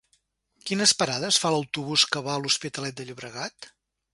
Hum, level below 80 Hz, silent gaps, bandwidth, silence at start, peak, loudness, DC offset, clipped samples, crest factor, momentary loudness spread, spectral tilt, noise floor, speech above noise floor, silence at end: none; -68 dBFS; none; 11.5 kHz; 0.65 s; -4 dBFS; -24 LUFS; under 0.1%; under 0.1%; 24 dB; 16 LU; -2 dB/octave; -70 dBFS; 44 dB; 0.45 s